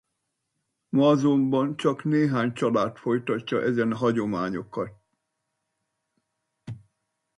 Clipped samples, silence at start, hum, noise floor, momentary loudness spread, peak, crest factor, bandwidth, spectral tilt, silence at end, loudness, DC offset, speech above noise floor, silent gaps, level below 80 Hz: under 0.1%; 0.95 s; none; -80 dBFS; 14 LU; -8 dBFS; 18 dB; 11 kHz; -7.5 dB/octave; 0.6 s; -25 LUFS; under 0.1%; 56 dB; none; -66 dBFS